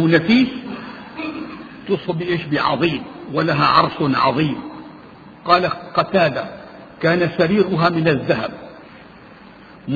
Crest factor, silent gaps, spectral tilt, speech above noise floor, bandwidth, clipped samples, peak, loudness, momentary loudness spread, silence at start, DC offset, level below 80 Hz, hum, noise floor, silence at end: 18 dB; none; -8 dB/octave; 25 dB; 7 kHz; under 0.1%; 0 dBFS; -18 LUFS; 19 LU; 0 s; under 0.1%; -52 dBFS; none; -42 dBFS; 0 s